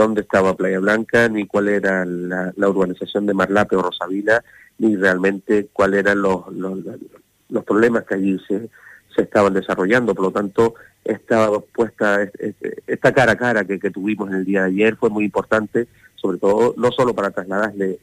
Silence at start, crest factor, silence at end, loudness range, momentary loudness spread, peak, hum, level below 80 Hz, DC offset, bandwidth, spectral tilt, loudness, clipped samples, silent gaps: 0 s; 16 dB; 0.05 s; 2 LU; 10 LU; -2 dBFS; none; -52 dBFS; under 0.1%; 14.5 kHz; -6.5 dB/octave; -19 LUFS; under 0.1%; none